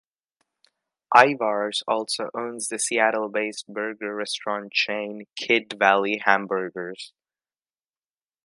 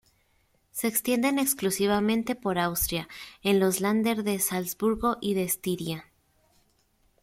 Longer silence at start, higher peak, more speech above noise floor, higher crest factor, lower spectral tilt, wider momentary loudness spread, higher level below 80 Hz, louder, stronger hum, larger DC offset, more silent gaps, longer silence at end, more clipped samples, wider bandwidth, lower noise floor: first, 1.1 s vs 0.75 s; first, 0 dBFS vs -10 dBFS; first, over 66 dB vs 41 dB; first, 24 dB vs 18 dB; second, -2 dB/octave vs -4 dB/octave; first, 13 LU vs 8 LU; second, -78 dBFS vs -52 dBFS; first, -23 LUFS vs -27 LUFS; neither; neither; neither; first, 1.35 s vs 1.2 s; neither; second, 11.5 kHz vs 16.5 kHz; first, under -90 dBFS vs -68 dBFS